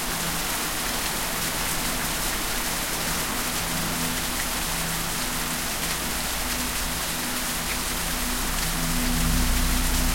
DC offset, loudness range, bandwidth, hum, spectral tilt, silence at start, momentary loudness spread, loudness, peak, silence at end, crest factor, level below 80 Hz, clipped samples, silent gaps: under 0.1%; 1 LU; 16.5 kHz; none; -2 dB/octave; 0 s; 2 LU; -25 LUFS; -10 dBFS; 0 s; 16 dB; -32 dBFS; under 0.1%; none